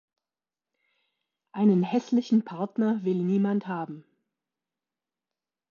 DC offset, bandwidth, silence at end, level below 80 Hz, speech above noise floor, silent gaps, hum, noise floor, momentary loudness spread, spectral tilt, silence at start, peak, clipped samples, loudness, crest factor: under 0.1%; 7 kHz; 1.7 s; -82 dBFS; over 65 dB; none; none; under -90 dBFS; 13 LU; -8.5 dB/octave; 1.55 s; -12 dBFS; under 0.1%; -26 LUFS; 18 dB